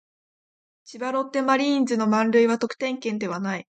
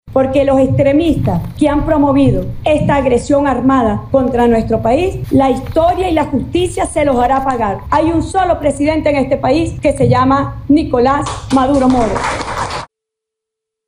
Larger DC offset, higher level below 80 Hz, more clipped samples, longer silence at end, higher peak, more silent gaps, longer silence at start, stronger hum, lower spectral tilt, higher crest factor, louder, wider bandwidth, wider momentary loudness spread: neither; second, -74 dBFS vs -30 dBFS; neither; second, 0.15 s vs 1 s; second, -8 dBFS vs 0 dBFS; neither; first, 0.85 s vs 0.05 s; neither; second, -5 dB/octave vs -6.5 dB/octave; about the same, 16 dB vs 12 dB; second, -23 LUFS vs -13 LUFS; second, 9 kHz vs 15 kHz; first, 8 LU vs 5 LU